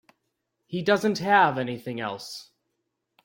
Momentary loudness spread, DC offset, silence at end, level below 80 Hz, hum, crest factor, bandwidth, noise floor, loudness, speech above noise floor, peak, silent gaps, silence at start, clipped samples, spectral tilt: 17 LU; under 0.1%; 0.8 s; -70 dBFS; none; 20 dB; 16.5 kHz; -79 dBFS; -24 LUFS; 55 dB; -6 dBFS; none; 0.7 s; under 0.1%; -5 dB/octave